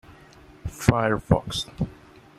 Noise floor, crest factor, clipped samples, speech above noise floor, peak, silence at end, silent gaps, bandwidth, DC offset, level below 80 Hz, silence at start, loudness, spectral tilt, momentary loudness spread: -50 dBFS; 24 dB; under 0.1%; 26 dB; -2 dBFS; 0.45 s; none; 16 kHz; under 0.1%; -40 dBFS; 0.1 s; -25 LUFS; -6 dB/octave; 14 LU